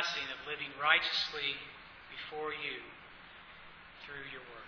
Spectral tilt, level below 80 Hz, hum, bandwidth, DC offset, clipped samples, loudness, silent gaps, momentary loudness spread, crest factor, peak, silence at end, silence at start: -1.5 dB/octave; -68 dBFS; none; 5.4 kHz; under 0.1%; under 0.1%; -35 LUFS; none; 24 LU; 28 dB; -10 dBFS; 0 s; 0 s